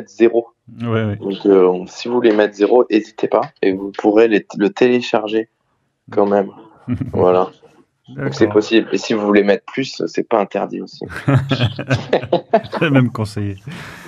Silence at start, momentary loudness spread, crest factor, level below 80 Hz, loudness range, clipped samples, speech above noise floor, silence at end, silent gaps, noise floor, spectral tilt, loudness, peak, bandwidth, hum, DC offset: 0 s; 12 LU; 16 dB; -52 dBFS; 3 LU; under 0.1%; 50 dB; 0 s; none; -66 dBFS; -7 dB/octave; -17 LUFS; 0 dBFS; 11 kHz; none; under 0.1%